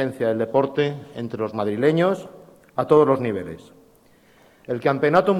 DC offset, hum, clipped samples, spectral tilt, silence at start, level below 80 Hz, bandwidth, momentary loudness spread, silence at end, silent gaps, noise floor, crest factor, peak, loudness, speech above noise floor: under 0.1%; none; under 0.1%; -7.5 dB/octave; 0 s; -62 dBFS; 12.5 kHz; 15 LU; 0 s; none; -55 dBFS; 16 dB; -6 dBFS; -22 LUFS; 34 dB